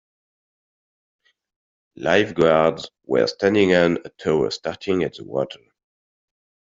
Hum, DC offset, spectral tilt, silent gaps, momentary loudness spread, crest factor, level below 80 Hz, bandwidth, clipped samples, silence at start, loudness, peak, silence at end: none; under 0.1%; -5.5 dB/octave; none; 11 LU; 20 dB; -58 dBFS; 7.8 kHz; under 0.1%; 2 s; -20 LUFS; -2 dBFS; 1.05 s